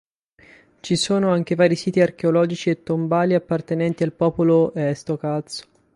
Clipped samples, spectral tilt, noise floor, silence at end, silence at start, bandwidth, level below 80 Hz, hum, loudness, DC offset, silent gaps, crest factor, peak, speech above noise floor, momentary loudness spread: under 0.1%; -6 dB/octave; -53 dBFS; 0.35 s; 0.85 s; 11.5 kHz; -58 dBFS; none; -20 LUFS; under 0.1%; none; 18 dB; -4 dBFS; 33 dB; 8 LU